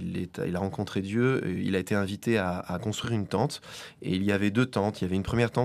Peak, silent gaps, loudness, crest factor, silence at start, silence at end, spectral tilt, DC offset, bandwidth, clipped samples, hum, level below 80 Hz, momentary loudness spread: -10 dBFS; none; -29 LUFS; 18 dB; 0 s; 0 s; -6.5 dB/octave; under 0.1%; 14.5 kHz; under 0.1%; none; -54 dBFS; 6 LU